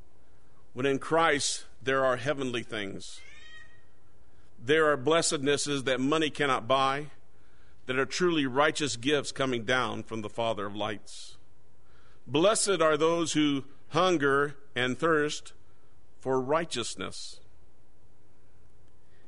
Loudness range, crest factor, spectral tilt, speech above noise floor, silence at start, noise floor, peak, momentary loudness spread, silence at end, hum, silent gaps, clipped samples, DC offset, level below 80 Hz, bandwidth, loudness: 6 LU; 20 dB; -3.5 dB/octave; 35 dB; 0.75 s; -63 dBFS; -10 dBFS; 16 LU; 1.9 s; none; none; under 0.1%; 1%; -62 dBFS; 11 kHz; -28 LUFS